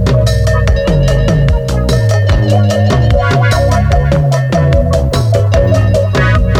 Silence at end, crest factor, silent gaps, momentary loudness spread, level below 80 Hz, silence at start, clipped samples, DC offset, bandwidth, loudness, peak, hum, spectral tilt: 0 s; 10 dB; none; 2 LU; -16 dBFS; 0 s; under 0.1%; under 0.1%; 13.5 kHz; -11 LUFS; 0 dBFS; none; -6.5 dB/octave